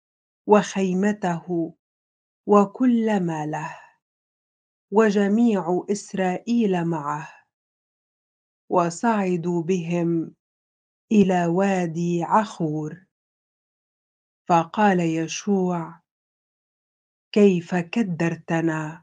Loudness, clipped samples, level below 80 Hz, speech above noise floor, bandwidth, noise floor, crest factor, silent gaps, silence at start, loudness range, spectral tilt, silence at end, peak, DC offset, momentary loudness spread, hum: -22 LUFS; under 0.1%; -70 dBFS; over 69 dB; 9.4 kHz; under -90 dBFS; 22 dB; 1.79-2.44 s, 4.02-4.88 s, 7.53-8.68 s, 10.40-11.08 s, 13.11-14.45 s, 16.11-17.31 s; 0.45 s; 3 LU; -6.5 dB/octave; 0.05 s; 0 dBFS; under 0.1%; 11 LU; none